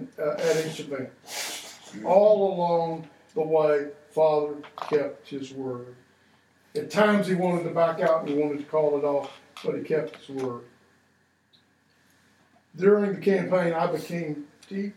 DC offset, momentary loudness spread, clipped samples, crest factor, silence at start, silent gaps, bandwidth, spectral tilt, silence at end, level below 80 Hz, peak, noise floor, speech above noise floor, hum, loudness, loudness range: under 0.1%; 14 LU; under 0.1%; 20 dB; 0 s; none; 16.5 kHz; -6 dB/octave; 0.05 s; -80 dBFS; -6 dBFS; -66 dBFS; 41 dB; none; -26 LUFS; 6 LU